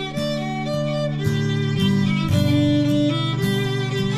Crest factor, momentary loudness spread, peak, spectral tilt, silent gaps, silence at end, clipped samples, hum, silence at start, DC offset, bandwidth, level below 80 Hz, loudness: 14 dB; 6 LU; -6 dBFS; -6.5 dB/octave; none; 0 s; under 0.1%; none; 0 s; under 0.1%; 15.5 kHz; -46 dBFS; -21 LUFS